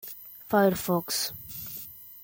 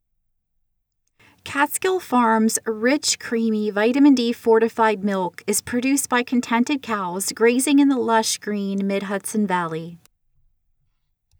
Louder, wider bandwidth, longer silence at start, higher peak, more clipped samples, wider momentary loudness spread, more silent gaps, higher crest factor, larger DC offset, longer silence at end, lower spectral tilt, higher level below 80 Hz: second, -28 LUFS vs -20 LUFS; second, 17 kHz vs over 20 kHz; second, 0 s vs 1.45 s; second, -10 dBFS vs -4 dBFS; neither; first, 17 LU vs 8 LU; neither; about the same, 20 dB vs 18 dB; neither; second, 0 s vs 1.45 s; about the same, -4 dB/octave vs -3.5 dB/octave; about the same, -62 dBFS vs -66 dBFS